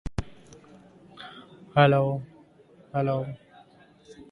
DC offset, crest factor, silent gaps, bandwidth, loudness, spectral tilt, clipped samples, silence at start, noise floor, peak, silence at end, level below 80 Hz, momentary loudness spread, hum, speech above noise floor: under 0.1%; 22 dB; none; 7.2 kHz; -26 LUFS; -7.5 dB/octave; under 0.1%; 0.05 s; -56 dBFS; -6 dBFS; 0.1 s; -48 dBFS; 26 LU; none; 33 dB